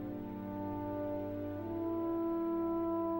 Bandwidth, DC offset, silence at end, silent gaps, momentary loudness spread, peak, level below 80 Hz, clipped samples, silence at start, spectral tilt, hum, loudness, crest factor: 16 kHz; under 0.1%; 0 s; none; 6 LU; -28 dBFS; -60 dBFS; under 0.1%; 0 s; -10 dB/octave; none; -38 LUFS; 10 dB